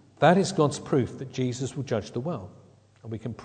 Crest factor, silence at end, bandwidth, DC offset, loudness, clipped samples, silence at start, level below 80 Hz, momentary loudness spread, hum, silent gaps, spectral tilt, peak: 22 dB; 0 s; 9.4 kHz; under 0.1%; -27 LUFS; under 0.1%; 0.2 s; -62 dBFS; 16 LU; none; none; -6 dB/octave; -6 dBFS